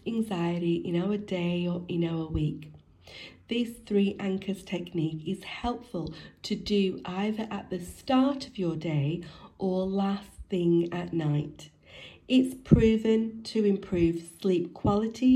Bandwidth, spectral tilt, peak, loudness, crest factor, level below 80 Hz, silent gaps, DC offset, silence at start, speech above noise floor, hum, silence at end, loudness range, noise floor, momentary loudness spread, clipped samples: 13 kHz; -7.5 dB/octave; -6 dBFS; -29 LUFS; 22 dB; -48 dBFS; none; under 0.1%; 0.05 s; 22 dB; none; 0 s; 5 LU; -50 dBFS; 12 LU; under 0.1%